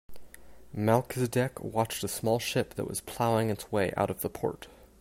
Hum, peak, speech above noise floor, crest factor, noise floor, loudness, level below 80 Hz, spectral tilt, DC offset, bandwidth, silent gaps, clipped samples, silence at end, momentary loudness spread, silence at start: none; -10 dBFS; 19 dB; 20 dB; -49 dBFS; -30 LUFS; -58 dBFS; -5 dB/octave; under 0.1%; 16 kHz; none; under 0.1%; 0.15 s; 8 LU; 0.1 s